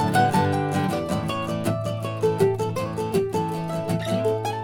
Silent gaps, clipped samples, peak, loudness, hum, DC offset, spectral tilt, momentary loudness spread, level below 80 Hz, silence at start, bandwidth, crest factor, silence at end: none; under 0.1%; -6 dBFS; -24 LUFS; none; under 0.1%; -6.5 dB/octave; 6 LU; -52 dBFS; 0 s; 18 kHz; 18 dB; 0 s